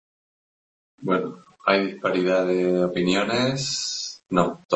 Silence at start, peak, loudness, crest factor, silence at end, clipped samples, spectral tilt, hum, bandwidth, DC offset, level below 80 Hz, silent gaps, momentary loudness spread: 1 s; -2 dBFS; -23 LUFS; 22 dB; 0 s; under 0.1%; -4.5 dB/octave; none; 8.4 kHz; under 0.1%; -60 dBFS; 4.65-4.69 s; 6 LU